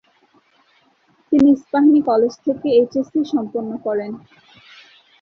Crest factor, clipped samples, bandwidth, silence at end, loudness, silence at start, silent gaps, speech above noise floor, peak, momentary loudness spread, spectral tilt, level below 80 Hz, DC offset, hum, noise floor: 14 dB; under 0.1%; 6.6 kHz; 1.05 s; -17 LUFS; 1.3 s; none; 42 dB; -4 dBFS; 11 LU; -7 dB/octave; -58 dBFS; under 0.1%; none; -59 dBFS